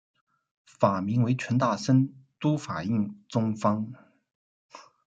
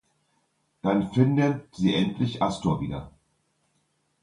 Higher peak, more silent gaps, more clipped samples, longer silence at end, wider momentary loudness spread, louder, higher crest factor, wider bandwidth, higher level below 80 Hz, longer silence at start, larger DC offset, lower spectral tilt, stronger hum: about the same, -6 dBFS vs -6 dBFS; first, 4.35-4.69 s vs none; neither; second, 0.25 s vs 1.15 s; about the same, 7 LU vs 9 LU; about the same, -27 LUFS vs -25 LUFS; about the same, 22 dB vs 20 dB; second, 8.8 kHz vs 11 kHz; second, -70 dBFS vs -52 dBFS; about the same, 0.8 s vs 0.85 s; neither; about the same, -7.5 dB/octave vs -7 dB/octave; neither